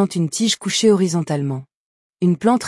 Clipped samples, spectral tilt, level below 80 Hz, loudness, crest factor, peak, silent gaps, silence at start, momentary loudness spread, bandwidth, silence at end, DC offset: under 0.1%; -5 dB/octave; -64 dBFS; -18 LUFS; 14 dB; -4 dBFS; 1.75-2.10 s; 0 s; 8 LU; 12 kHz; 0 s; under 0.1%